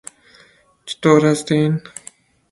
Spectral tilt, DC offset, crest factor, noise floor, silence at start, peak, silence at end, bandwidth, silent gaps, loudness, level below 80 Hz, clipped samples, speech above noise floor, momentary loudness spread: -6 dB/octave; under 0.1%; 18 dB; -52 dBFS; 0.85 s; 0 dBFS; 0.75 s; 11.5 kHz; none; -16 LUFS; -58 dBFS; under 0.1%; 37 dB; 23 LU